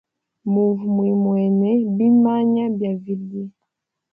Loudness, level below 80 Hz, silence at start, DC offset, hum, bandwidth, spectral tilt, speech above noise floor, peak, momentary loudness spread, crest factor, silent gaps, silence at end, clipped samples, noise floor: -19 LUFS; -68 dBFS; 0.45 s; under 0.1%; none; 3.3 kHz; -12 dB/octave; 61 dB; -8 dBFS; 14 LU; 12 dB; none; 0.65 s; under 0.1%; -79 dBFS